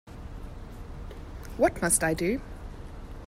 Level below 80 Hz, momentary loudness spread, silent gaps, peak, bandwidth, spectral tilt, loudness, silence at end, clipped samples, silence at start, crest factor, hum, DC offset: -42 dBFS; 20 LU; none; -10 dBFS; 16 kHz; -4 dB/octave; -26 LUFS; 0 s; under 0.1%; 0.05 s; 20 dB; none; under 0.1%